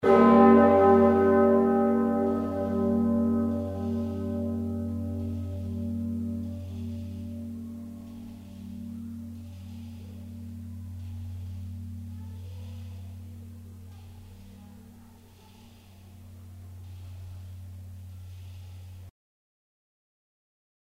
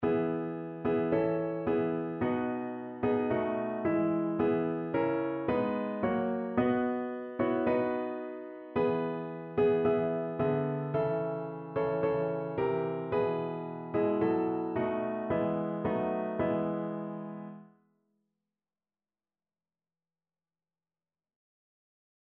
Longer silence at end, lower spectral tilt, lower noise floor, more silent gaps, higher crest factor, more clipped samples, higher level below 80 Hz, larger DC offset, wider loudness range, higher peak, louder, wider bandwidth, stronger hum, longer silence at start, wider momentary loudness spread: second, 1.9 s vs 4.65 s; first, -9 dB/octave vs -7 dB/octave; second, -52 dBFS vs under -90 dBFS; neither; about the same, 22 dB vs 18 dB; neither; first, -56 dBFS vs -64 dBFS; neither; first, 24 LU vs 4 LU; first, -6 dBFS vs -14 dBFS; first, -25 LUFS vs -32 LUFS; first, 7.4 kHz vs 4.3 kHz; neither; about the same, 0 s vs 0 s; first, 25 LU vs 8 LU